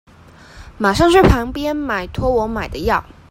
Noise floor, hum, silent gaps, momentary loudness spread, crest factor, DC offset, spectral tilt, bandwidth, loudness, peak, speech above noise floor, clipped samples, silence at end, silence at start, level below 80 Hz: -43 dBFS; none; none; 11 LU; 18 dB; under 0.1%; -6 dB/octave; 16.5 kHz; -17 LUFS; 0 dBFS; 27 dB; under 0.1%; 0.3 s; 0.55 s; -28 dBFS